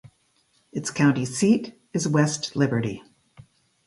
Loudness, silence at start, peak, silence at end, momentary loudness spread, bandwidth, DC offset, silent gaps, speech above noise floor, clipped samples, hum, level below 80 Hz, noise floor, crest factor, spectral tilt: -24 LUFS; 0.05 s; -6 dBFS; 0.85 s; 11 LU; 11.5 kHz; under 0.1%; none; 43 dB; under 0.1%; none; -62 dBFS; -66 dBFS; 18 dB; -5.5 dB/octave